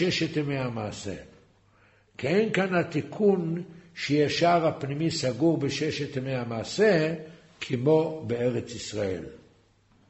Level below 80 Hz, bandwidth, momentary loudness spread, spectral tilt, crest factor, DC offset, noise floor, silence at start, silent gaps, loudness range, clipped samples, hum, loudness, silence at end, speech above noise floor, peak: -60 dBFS; 8.2 kHz; 14 LU; -5.5 dB/octave; 18 dB; under 0.1%; -62 dBFS; 0 s; none; 3 LU; under 0.1%; none; -27 LUFS; 0.7 s; 36 dB; -10 dBFS